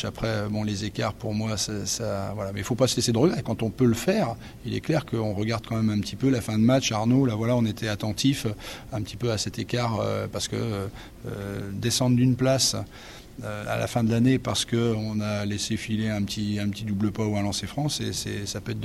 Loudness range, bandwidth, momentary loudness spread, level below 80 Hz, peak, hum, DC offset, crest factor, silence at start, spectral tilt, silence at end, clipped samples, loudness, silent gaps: 4 LU; 15.5 kHz; 11 LU; -50 dBFS; -8 dBFS; none; under 0.1%; 18 dB; 0 s; -5 dB/octave; 0 s; under 0.1%; -26 LUFS; none